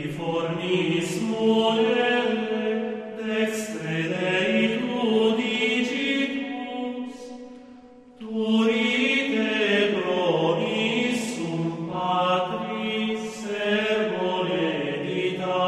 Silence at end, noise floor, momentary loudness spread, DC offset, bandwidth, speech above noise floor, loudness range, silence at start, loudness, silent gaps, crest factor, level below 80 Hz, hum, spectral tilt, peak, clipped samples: 0 s; -47 dBFS; 10 LU; under 0.1%; 13 kHz; 24 dB; 3 LU; 0 s; -24 LUFS; none; 16 dB; -66 dBFS; none; -5 dB/octave; -10 dBFS; under 0.1%